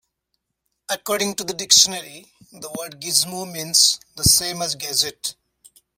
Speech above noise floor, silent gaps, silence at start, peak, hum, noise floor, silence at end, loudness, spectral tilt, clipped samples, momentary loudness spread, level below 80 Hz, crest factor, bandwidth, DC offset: 55 dB; none; 0.9 s; 0 dBFS; none; -76 dBFS; 0.65 s; -18 LUFS; -1 dB/octave; under 0.1%; 18 LU; -46 dBFS; 22 dB; 16.5 kHz; under 0.1%